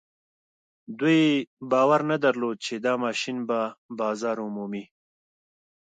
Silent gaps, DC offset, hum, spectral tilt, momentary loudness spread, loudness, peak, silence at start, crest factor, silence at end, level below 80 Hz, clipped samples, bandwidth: 1.47-1.57 s, 3.78-3.89 s; under 0.1%; none; -5.5 dB/octave; 12 LU; -25 LUFS; -10 dBFS; 0.9 s; 18 dB; 1 s; -78 dBFS; under 0.1%; 9.2 kHz